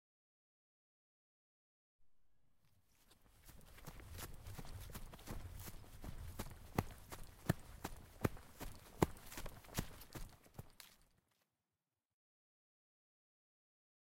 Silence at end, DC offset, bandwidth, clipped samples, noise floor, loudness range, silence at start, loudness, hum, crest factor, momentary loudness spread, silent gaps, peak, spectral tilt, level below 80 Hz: 3.1 s; under 0.1%; 16.5 kHz; under 0.1%; under -90 dBFS; 17 LU; 2 s; -49 LUFS; none; 36 dB; 16 LU; none; -14 dBFS; -5.5 dB/octave; -58 dBFS